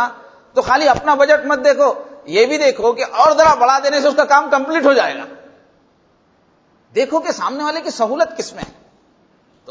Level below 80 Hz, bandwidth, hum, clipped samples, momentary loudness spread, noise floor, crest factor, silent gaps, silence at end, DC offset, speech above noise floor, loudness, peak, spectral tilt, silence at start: -52 dBFS; 8 kHz; none; under 0.1%; 11 LU; -56 dBFS; 16 dB; none; 1 s; under 0.1%; 42 dB; -14 LUFS; 0 dBFS; -3 dB/octave; 0 s